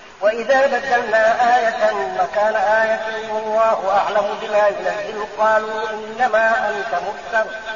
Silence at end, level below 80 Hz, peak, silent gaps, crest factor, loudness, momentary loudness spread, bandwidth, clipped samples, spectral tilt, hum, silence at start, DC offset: 0 s; -56 dBFS; -6 dBFS; none; 12 dB; -18 LUFS; 8 LU; 7.2 kHz; under 0.1%; -0.5 dB/octave; none; 0 s; 0.3%